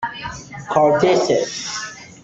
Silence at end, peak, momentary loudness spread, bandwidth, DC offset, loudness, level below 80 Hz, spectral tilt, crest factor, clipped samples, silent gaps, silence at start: 0.05 s; -2 dBFS; 17 LU; 8.2 kHz; under 0.1%; -18 LUFS; -52 dBFS; -4 dB/octave; 16 dB; under 0.1%; none; 0 s